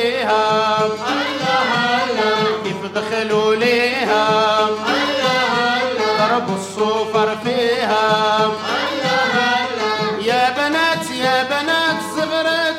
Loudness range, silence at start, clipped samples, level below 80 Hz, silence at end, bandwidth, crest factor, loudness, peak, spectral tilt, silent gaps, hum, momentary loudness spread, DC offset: 1 LU; 0 s; under 0.1%; -64 dBFS; 0 s; 16 kHz; 14 dB; -17 LUFS; -2 dBFS; -3.5 dB/octave; none; none; 5 LU; under 0.1%